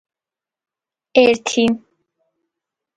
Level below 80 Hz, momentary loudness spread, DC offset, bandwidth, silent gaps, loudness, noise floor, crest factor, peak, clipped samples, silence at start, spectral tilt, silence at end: -62 dBFS; 6 LU; under 0.1%; 9.4 kHz; none; -16 LUFS; -89 dBFS; 20 dB; 0 dBFS; under 0.1%; 1.15 s; -3.5 dB/octave; 1.2 s